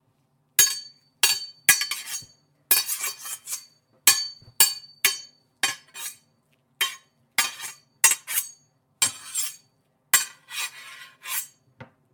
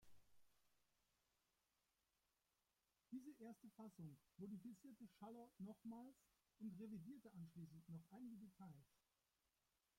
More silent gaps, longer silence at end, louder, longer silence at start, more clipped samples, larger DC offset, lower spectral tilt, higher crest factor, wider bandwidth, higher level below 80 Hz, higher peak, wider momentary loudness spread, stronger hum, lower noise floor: neither; second, 0.3 s vs 1.05 s; first, -23 LUFS vs -60 LUFS; first, 0.6 s vs 0 s; neither; neither; second, 2.5 dB/octave vs -8 dB/octave; first, 26 dB vs 16 dB; first, 19.5 kHz vs 16.5 kHz; first, -76 dBFS vs -90 dBFS; first, -2 dBFS vs -46 dBFS; first, 17 LU vs 6 LU; neither; second, -68 dBFS vs under -90 dBFS